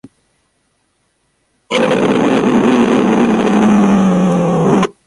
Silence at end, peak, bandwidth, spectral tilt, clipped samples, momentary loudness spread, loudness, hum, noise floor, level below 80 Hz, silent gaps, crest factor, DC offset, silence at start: 0.15 s; 0 dBFS; 11.5 kHz; -6.5 dB/octave; under 0.1%; 3 LU; -12 LUFS; none; -62 dBFS; -46 dBFS; none; 12 dB; under 0.1%; 1.7 s